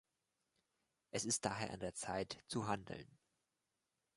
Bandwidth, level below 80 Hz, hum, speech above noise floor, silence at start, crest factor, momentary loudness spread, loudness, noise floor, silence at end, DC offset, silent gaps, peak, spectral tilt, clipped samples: 11.5 kHz; -72 dBFS; none; 46 dB; 1.15 s; 26 dB; 8 LU; -43 LUFS; -89 dBFS; 1.1 s; under 0.1%; none; -22 dBFS; -3.5 dB/octave; under 0.1%